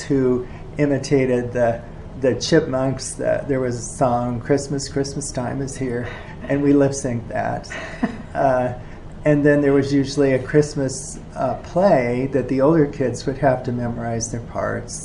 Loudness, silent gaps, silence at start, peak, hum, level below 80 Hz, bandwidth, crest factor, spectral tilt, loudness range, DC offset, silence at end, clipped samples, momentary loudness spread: -20 LUFS; none; 0 s; -2 dBFS; none; -40 dBFS; 11.5 kHz; 18 dB; -6 dB/octave; 3 LU; under 0.1%; 0 s; under 0.1%; 10 LU